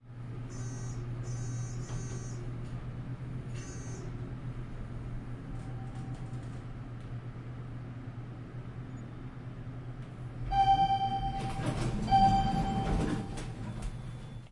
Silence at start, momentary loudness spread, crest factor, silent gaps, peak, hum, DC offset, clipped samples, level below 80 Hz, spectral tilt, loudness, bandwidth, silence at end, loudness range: 0.05 s; 17 LU; 20 dB; none; -14 dBFS; none; under 0.1%; under 0.1%; -44 dBFS; -6 dB/octave; -35 LUFS; 11.5 kHz; 0 s; 13 LU